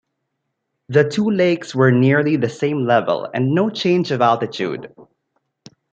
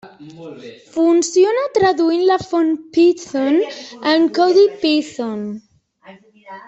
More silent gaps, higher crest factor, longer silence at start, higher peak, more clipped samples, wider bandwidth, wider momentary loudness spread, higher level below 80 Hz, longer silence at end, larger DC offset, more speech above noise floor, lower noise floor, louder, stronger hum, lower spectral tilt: neither; about the same, 16 dB vs 14 dB; first, 0.9 s vs 0.05 s; about the same, -2 dBFS vs -4 dBFS; neither; about the same, 8.4 kHz vs 8.2 kHz; second, 7 LU vs 19 LU; about the same, -64 dBFS vs -60 dBFS; first, 0.9 s vs 0.1 s; neither; first, 58 dB vs 29 dB; first, -75 dBFS vs -45 dBFS; about the same, -17 LUFS vs -16 LUFS; neither; first, -7 dB/octave vs -4 dB/octave